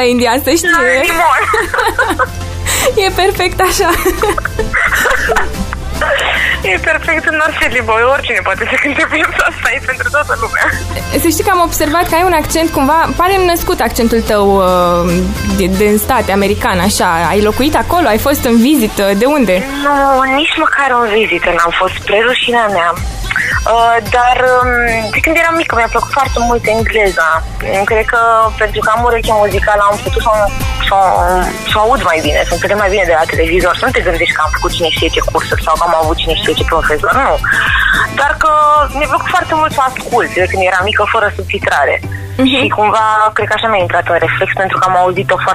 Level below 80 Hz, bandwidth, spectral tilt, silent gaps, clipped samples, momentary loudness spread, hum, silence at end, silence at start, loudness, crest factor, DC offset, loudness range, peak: -24 dBFS; 15.5 kHz; -4 dB/octave; none; under 0.1%; 4 LU; none; 0 s; 0 s; -11 LUFS; 12 dB; under 0.1%; 2 LU; 0 dBFS